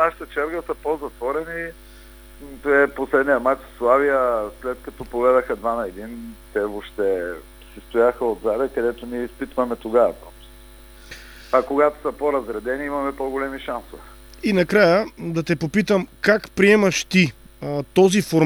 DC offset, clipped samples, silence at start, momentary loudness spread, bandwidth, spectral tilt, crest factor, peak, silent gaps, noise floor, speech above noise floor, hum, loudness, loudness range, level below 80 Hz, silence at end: under 0.1%; under 0.1%; 0 s; 14 LU; over 20 kHz; -5.5 dB/octave; 20 dB; -2 dBFS; none; -44 dBFS; 23 dB; none; -21 LUFS; 5 LU; -46 dBFS; 0 s